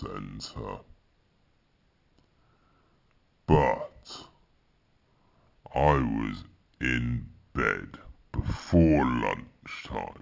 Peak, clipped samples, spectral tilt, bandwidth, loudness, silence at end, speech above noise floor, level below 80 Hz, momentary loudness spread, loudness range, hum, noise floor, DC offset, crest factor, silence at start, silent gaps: -8 dBFS; under 0.1%; -7.5 dB/octave; 7.6 kHz; -28 LUFS; 0 s; 41 dB; -42 dBFS; 20 LU; 5 LU; none; -68 dBFS; under 0.1%; 22 dB; 0 s; none